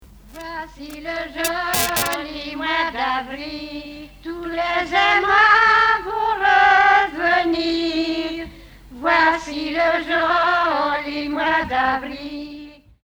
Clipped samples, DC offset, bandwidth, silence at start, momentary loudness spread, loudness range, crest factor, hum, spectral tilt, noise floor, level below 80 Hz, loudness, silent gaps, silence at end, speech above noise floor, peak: under 0.1%; under 0.1%; over 20 kHz; 0.25 s; 19 LU; 8 LU; 16 dB; none; -2.5 dB/octave; -41 dBFS; -46 dBFS; -18 LUFS; none; 0.35 s; 21 dB; -2 dBFS